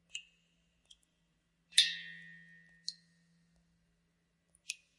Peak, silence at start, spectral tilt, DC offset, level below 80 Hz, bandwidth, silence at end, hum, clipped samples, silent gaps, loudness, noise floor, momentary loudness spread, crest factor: -10 dBFS; 0.15 s; 3 dB/octave; under 0.1%; -84 dBFS; 11.5 kHz; 0.25 s; none; under 0.1%; none; -33 LUFS; -78 dBFS; 22 LU; 32 dB